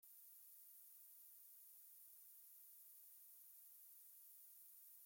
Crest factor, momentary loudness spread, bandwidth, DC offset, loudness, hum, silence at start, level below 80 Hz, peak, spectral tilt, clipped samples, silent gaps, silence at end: 14 dB; 0 LU; 17 kHz; under 0.1%; -61 LUFS; none; 0 s; under -90 dBFS; -52 dBFS; 3 dB/octave; under 0.1%; none; 0 s